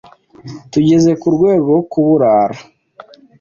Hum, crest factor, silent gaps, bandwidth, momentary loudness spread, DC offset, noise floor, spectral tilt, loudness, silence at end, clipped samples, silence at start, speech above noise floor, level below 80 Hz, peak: none; 12 dB; none; 7.4 kHz; 18 LU; under 0.1%; -41 dBFS; -7.5 dB/octave; -13 LUFS; 0.8 s; under 0.1%; 0.45 s; 29 dB; -52 dBFS; -2 dBFS